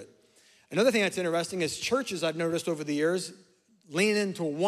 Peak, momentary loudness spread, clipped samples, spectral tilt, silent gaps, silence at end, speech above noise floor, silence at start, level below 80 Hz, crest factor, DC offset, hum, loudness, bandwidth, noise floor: -12 dBFS; 7 LU; under 0.1%; -4 dB/octave; none; 0 s; 33 dB; 0 s; -74 dBFS; 18 dB; under 0.1%; none; -28 LUFS; 15 kHz; -61 dBFS